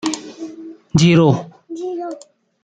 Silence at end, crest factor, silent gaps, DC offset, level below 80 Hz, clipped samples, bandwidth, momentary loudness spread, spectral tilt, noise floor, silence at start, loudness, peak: 0.45 s; 16 dB; none; under 0.1%; -50 dBFS; under 0.1%; 9.2 kHz; 21 LU; -6 dB/octave; -41 dBFS; 0.05 s; -16 LUFS; -2 dBFS